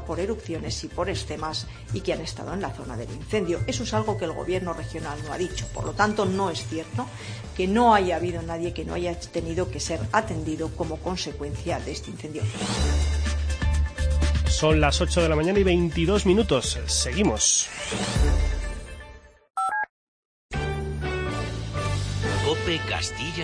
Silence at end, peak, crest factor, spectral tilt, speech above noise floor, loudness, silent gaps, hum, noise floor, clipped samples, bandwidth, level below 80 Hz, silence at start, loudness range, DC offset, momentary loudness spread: 0 s; -6 dBFS; 20 dB; -4.5 dB/octave; 21 dB; -26 LUFS; 19.90-20.49 s; none; -46 dBFS; under 0.1%; 10.5 kHz; -32 dBFS; 0 s; 7 LU; under 0.1%; 12 LU